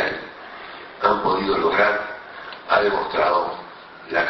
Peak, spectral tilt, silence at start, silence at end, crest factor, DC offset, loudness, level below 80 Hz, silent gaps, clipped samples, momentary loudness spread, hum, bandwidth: -4 dBFS; -6 dB/octave; 0 s; 0 s; 18 dB; under 0.1%; -20 LUFS; -54 dBFS; none; under 0.1%; 18 LU; none; 6 kHz